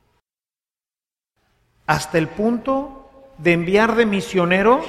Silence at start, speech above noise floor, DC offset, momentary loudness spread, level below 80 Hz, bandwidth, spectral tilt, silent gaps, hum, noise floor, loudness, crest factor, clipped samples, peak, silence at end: 1.9 s; over 72 dB; under 0.1%; 8 LU; -48 dBFS; 15 kHz; -6 dB/octave; none; none; under -90 dBFS; -19 LUFS; 18 dB; under 0.1%; -2 dBFS; 0 s